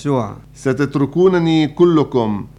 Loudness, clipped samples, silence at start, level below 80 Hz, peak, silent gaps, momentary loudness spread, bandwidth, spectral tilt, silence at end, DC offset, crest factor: -16 LUFS; under 0.1%; 0 s; -46 dBFS; -2 dBFS; none; 8 LU; 10.5 kHz; -7.5 dB/octave; 0.1 s; under 0.1%; 14 dB